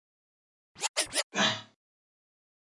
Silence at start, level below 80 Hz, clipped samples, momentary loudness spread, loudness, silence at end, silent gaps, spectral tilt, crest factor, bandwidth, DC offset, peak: 0.75 s; -74 dBFS; under 0.1%; 8 LU; -29 LUFS; 1 s; 0.89-0.94 s, 1.23-1.30 s; -1 dB/octave; 22 dB; 11.5 kHz; under 0.1%; -14 dBFS